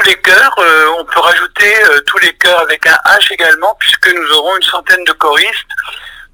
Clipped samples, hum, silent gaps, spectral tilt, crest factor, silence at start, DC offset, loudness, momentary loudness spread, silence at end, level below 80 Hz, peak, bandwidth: 1%; none; none; 0 dB/octave; 10 dB; 0 s; under 0.1%; -7 LUFS; 6 LU; 0.1 s; -48 dBFS; 0 dBFS; 16 kHz